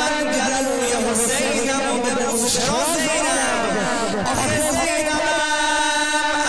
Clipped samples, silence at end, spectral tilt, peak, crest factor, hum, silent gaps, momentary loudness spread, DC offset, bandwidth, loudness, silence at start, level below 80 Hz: under 0.1%; 0 s; -2 dB/octave; -6 dBFS; 14 dB; none; none; 3 LU; 1%; 11 kHz; -19 LUFS; 0 s; -44 dBFS